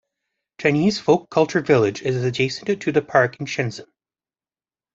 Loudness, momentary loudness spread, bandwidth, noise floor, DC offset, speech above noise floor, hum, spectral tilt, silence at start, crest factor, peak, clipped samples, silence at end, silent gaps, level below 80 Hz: -20 LUFS; 7 LU; 7.8 kHz; under -90 dBFS; under 0.1%; over 70 dB; none; -6 dB/octave; 0.6 s; 20 dB; -2 dBFS; under 0.1%; 1.1 s; none; -60 dBFS